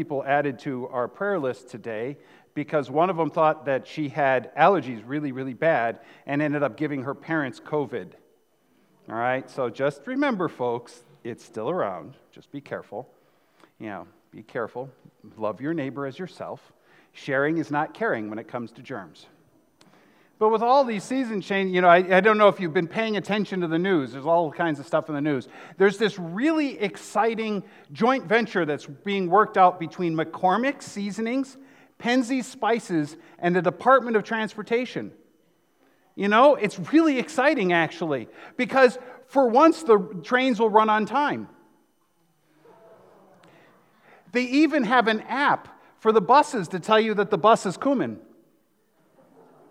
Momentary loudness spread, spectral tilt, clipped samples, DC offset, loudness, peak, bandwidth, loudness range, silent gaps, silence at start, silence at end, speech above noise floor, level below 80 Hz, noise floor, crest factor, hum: 17 LU; -6 dB/octave; under 0.1%; under 0.1%; -23 LUFS; -2 dBFS; 12.5 kHz; 11 LU; none; 0 s; 1.5 s; 44 dB; -80 dBFS; -68 dBFS; 22 dB; none